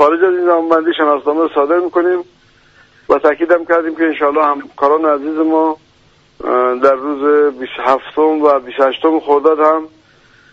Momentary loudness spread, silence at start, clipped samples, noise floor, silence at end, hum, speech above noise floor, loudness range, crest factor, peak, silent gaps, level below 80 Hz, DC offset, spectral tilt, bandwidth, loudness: 5 LU; 0 s; under 0.1%; -50 dBFS; 0.65 s; none; 38 dB; 2 LU; 14 dB; 0 dBFS; none; -56 dBFS; under 0.1%; -5.5 dB/octave; 7.2 kHz; -13 LUFS